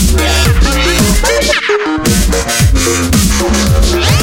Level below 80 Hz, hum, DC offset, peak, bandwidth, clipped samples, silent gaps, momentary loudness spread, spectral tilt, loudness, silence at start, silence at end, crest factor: -14 dBFS; none; under 0.1%; 0 dBFS; 17 kHz; under 0.1%; none; 2 LU; -4 dB/octave; -10 LUFS; 0 s; 0 s; 10 dB